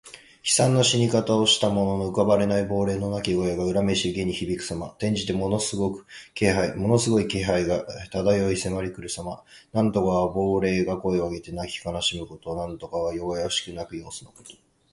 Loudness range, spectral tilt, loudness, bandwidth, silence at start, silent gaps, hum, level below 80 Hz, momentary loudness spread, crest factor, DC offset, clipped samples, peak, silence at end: 6 LU; -4.5 dB/octave; -24 LUFS; 11.5 kHz; 0.05 s; none; none; -48 dBFS; 13 LU; 20 dB; under 0.1%; under 0.1%; -4 dBFS; 0.4 s